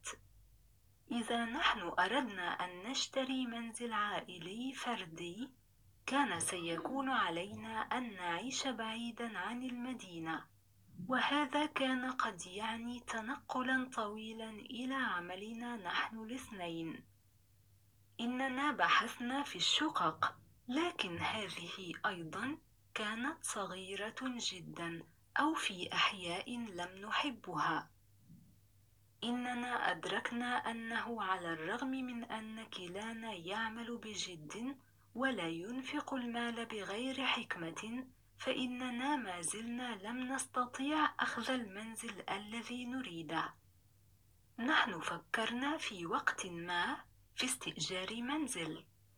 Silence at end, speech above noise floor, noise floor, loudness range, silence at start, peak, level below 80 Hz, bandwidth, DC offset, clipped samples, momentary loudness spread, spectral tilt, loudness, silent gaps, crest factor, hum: 0.35 s; 31 dB; -70 dBFS; 5 LU; 0.05 s; -16 dBFS; -76 dBFS; over 20 kHz; under 0.1%; under 0.1%; 11 LU; -2.5 dB/octave; -39 LUFS; none; 24 dB; none